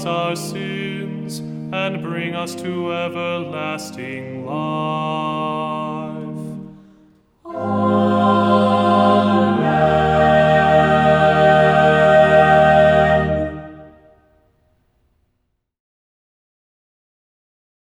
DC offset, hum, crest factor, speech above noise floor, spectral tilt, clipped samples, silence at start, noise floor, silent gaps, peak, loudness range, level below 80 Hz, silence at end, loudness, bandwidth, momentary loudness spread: under 0.1%; none; 16 dB; 49 dB; -6.5 dB/octave; under 0.1%; 0 s; -70 dBFS; none; -2 dBFS; 12 LU; -42 dBFS; 3.95 s; -16 LUFS; 14.5 kHz; 16 LU